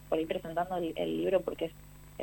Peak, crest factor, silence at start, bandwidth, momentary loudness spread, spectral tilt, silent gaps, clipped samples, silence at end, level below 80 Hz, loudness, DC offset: -16 dBFS; 18 dB; 0 s; 19 kHz; 12 LU; -6.5 dB/octave; none; under 0.1%; 0 s; -56 dBFS; -33 LUFS; under 0.1%